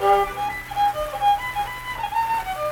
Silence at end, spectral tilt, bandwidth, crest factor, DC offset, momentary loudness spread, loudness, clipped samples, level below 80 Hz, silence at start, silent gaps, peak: 0 s; -3.5 dB/octave; 19 kHz; 16 dB; under 0.1%; 7 LU; -23 LUFS; under 0.1%; -44 dBFS; 0 s; none; -8 dBFS